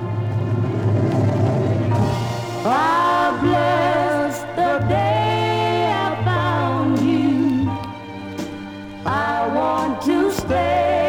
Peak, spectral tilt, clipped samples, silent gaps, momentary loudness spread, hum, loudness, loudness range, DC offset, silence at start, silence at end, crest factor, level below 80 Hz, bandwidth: -6 dBFS; -7 dB/octave; under 0.1%; none; 9 LU; none; -19 LUFS; 3 LU; under 0.1%; 0 s; 0 s; 14 dB; -46 dBFS; 18 kHz